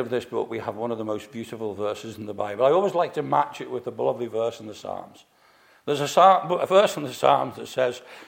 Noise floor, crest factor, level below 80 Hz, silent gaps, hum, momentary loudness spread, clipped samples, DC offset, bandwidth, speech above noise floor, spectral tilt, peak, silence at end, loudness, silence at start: -57 dBFS; 20 dB; -72 dBFS; none; none; 16 LU; under 0.1%; under 0.1%; 16.5 kHz; 33 dB; -5 dB/octave; -4 dBFS; 0 s; -24 LUFS; 0 s